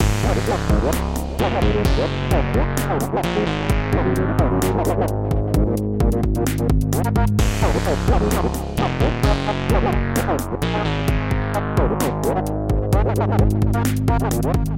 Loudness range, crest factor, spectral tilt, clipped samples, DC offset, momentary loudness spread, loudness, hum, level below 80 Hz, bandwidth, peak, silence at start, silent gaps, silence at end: 1 LU; 14 dB; -6.5 dB/octave; under 0.1%; under 0.1%; 3 LU; -20 LUFS; none; -24 dBFS; 17 kHz; -4 dBFS; 0 s; none; 0 s